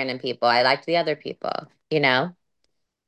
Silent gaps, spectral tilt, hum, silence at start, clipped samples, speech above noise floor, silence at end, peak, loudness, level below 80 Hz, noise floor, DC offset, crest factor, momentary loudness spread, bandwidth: none; -5.5 dB/octave; none; 0 s; under 0.1%; 53 dB; 0.75 s; -6 dBFS; -22 LUFS; -74 dBFS; -76 dBFS; under 0.1%; 18 dB; 11 LU; 9.4 kHz